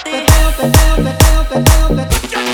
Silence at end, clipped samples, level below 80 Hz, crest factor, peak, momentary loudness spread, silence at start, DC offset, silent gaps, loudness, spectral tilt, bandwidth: 0 s; under 0.1%; -12 dBFS; 10 dB; 0 dBFS; 5 LU; 0 s; under 0.1%; none; -12 LUFS; -4.5 dB/octave; over 20 kHz